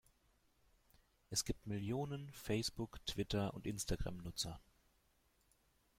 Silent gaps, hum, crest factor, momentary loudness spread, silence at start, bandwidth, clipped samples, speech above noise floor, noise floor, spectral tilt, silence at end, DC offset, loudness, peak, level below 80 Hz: none; none; 20 dB; 6 LU; 1.3 s; 16.5 kHz; under 0.1%; 34 dB; -77 dBFS; -4 dB/octave; 1.35 s; under 0.1%; -43 LUFS; -24 dBFS; -56 dBFS